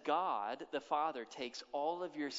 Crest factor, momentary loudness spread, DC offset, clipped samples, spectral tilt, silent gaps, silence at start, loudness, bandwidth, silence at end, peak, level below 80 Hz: 18 dB; 9 LU; under 0.1%; under 0.1%; -1.5 dB/octave; none; 0 s; -40 LUFS; 7.6 kHz; 0 s; -20 dBFS; -86 dBFS